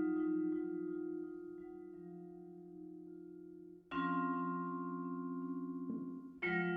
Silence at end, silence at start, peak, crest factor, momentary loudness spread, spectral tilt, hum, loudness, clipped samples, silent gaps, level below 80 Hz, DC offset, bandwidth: 0 s; 0 s; -24 dBFS; 18 dB; 16 LU; -6 dB/octave; none; -42 LUFS; under 0.1%; none; -78 dBFS; under 0.1%; 4.8 kHz